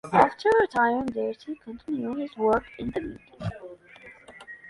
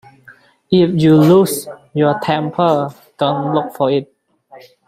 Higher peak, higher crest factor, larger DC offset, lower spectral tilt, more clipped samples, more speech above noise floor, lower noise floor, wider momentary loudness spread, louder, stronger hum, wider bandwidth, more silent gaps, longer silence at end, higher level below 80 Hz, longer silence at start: second, -4 dBFS vs 0 dBFS; first, 22 dB vs 14 dB; neither; about the same, -6.5 dB/octave vs -6.5 dB/octave; neither; second, 25 dB vs 32 dB; first, -50 dBFS vs -46 dBFS; first, 24 LU vs 10 LU; second, -26 LUFS vs -15 LUFS; neither; second, 11.5 kHz vs 16 kHz; neither; second, 0 s vs 0.3 s; about the same, -54 dBFS vs -56 dBFS; second, 0.05 s vs 0.7 s